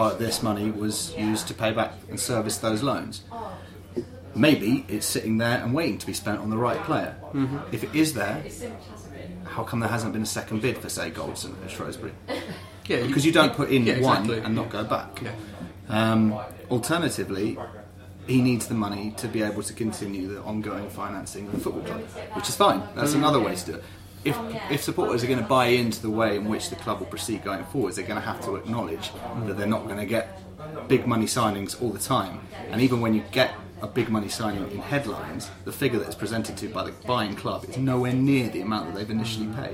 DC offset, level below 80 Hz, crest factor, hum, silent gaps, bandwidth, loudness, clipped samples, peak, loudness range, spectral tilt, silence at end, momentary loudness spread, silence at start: under 0.1%; -54 dBFS; 22 dB; none; none; 16 kHz; -26 LUFS; under 0.1%; -4 dBFS; 6 LU; -5 dB/octave; 0 s; 14 LU; 0 s